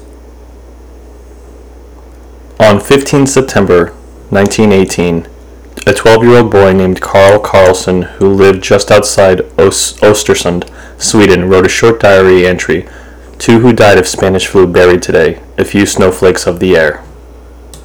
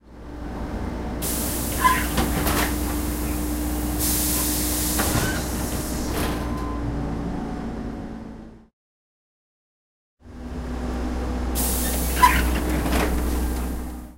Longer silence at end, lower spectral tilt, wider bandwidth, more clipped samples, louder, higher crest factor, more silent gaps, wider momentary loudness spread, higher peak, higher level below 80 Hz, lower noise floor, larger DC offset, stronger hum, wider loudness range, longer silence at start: about the same, 0.1 s vs 0 s; about the same, -5 dB/octave vs -4 dB/octave; first, 20 kHz vs 16 kHz; first, 6% vs under 0.1%; first, -7 LUFS vs -24 LUFS; second, 8 dB vs 22 dB; second, none vs 8.73-10.17 s; second, 8 LU vs 13 LU; about the same, 0 dBFS vs -2 dBFS; about the same, -32 dBFS vs -30 dBFS; second, -32 dBFS vs under -90 dBFS; first, 1% vs under 0.1%; neither; second, 4 LU vs 12 LU; first, 1.5 s vs 0.05 s